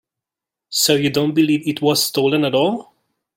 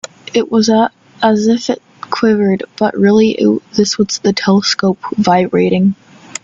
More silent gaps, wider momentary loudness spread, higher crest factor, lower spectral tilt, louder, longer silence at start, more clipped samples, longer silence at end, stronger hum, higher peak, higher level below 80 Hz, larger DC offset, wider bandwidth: neither; about the same, 5 LU vs 7 LU; about the same, 16 dB vs 12 dB; about the same, -4 dB/octave vs -5 dB/octave; second, -17 LUFS vs -13 LUFS; first, 0.7 s vs 0.35 s; neither; first, 0.55 s vs 0.05 s; neither; about the same, -2 dBFS vs 0 dBFS; second, -60 dBFS vs -54 dBFS; neither; first, 16.5 kHz vs 8 kHz